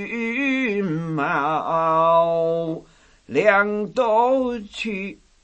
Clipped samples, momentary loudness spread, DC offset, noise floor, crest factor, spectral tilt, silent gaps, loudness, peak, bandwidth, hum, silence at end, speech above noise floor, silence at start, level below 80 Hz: under 0.1%; 11 LU; under 0.1%; -50 dBFS; 18 dB; -6.5 dB/octave; none; -21 LUFS; -2 dBFS; 8.6 kHz; none; 0.3 s; 29 dB; 0 s; -56 dBFS